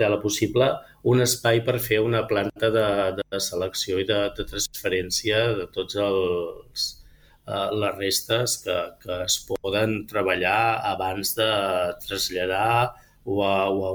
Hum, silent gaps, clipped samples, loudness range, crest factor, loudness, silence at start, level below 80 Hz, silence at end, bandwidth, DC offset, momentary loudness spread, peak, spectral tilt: none; none; under 0.1%; 3 LU; 16 dB; -24 LUFS; 0 s; -50 dBFS; 0 s; over 20 kHz; under 0.1%; 7 LU; -8 dBFS; -3.5 dB/octave